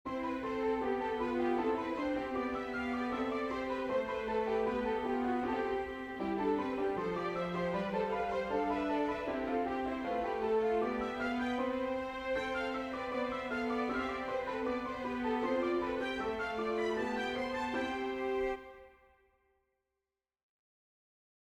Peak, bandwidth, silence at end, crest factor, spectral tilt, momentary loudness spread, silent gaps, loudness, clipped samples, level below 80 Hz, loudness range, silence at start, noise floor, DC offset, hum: -22 dBFS; 11.5 kHz; 2.65 s; 14 dB; -6 dB/octave; 4 LU; none; -35 LUFS; under 0.1%; -60 dBFS; 3 LU; 0.05 s; under -90 dBFS; under 0.1%; none